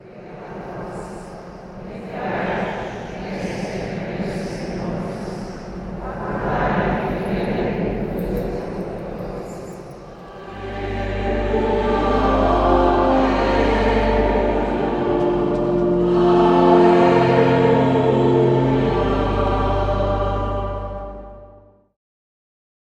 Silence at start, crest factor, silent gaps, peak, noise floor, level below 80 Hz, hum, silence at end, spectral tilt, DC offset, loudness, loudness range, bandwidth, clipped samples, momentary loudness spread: 0.05 s; 18 dB; none; -2 dBFS; -48 dBFS; -32 dBFS; none; 1.4 s; -8 dB/octave; under 0.1%; -19 LUFS; 12 LU; 10.5 kHz; under 0.1%; 19 LU